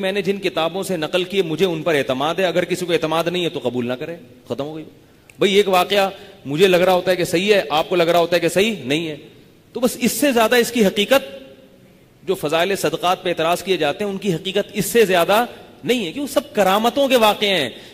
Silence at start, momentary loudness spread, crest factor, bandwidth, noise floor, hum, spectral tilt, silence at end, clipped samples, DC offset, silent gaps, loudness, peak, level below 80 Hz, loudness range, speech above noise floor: 0 s; 12 LU; 16 dB; 15.5 kHz; -49 dBFS; none; -4 dB/octave; 0 s; under 0.1%; under 0.1%; none; -18 LUFS; -2 dBFS; -56 dBFS; 4 LU; 30 dB